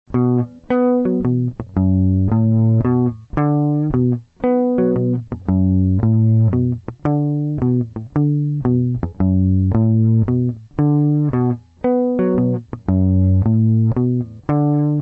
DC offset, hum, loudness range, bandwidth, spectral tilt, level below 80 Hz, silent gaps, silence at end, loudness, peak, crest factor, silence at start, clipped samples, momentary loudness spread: under 0.1%; none; 1 LU; 3.2 kHz; -12.5 dB/octave; -40 dBFS; none; 0 s; -17 LUFS; -6 dBFS; 10 dB; 0.1 s; under 0.1%; 6 LU